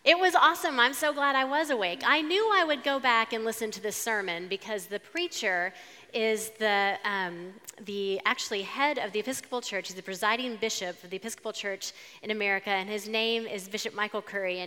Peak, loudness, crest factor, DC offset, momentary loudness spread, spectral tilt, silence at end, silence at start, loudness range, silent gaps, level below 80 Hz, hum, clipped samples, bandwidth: -6 dBFS; -28 LUFS; 24 dB; under 0.1%; 12 LU; -2 dB/octave; 0 s; 0.05 s; 6 LU; none; -86 dBFS; none; under 0.1%; 17.5 kHz